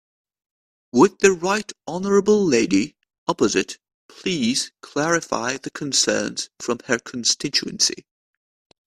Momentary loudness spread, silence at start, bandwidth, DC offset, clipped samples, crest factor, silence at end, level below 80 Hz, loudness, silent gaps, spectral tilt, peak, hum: 11 LU; 0.95 s; 14 kHz; under 0.1%; under 0.1%; 22 dB; 0.85 s; -58 dBFS; -21 LUFS; 3.18-3.27 s, 3.94-4.09 s; -3 dB/octave; 0 dBFS; none